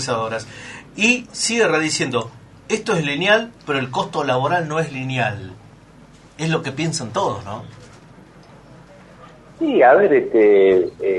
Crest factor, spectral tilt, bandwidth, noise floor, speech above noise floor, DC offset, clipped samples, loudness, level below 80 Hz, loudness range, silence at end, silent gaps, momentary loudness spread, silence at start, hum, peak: 18 dB; -4.5 dB/octave; 11.5 kHz; -46 dBFS; 27 dB; under 0.1%; under 0.1%; -18 LUFS; -56 dBFS; 9 LU; 0 s; none; 17 LU; 0 s; none; 0 dBFS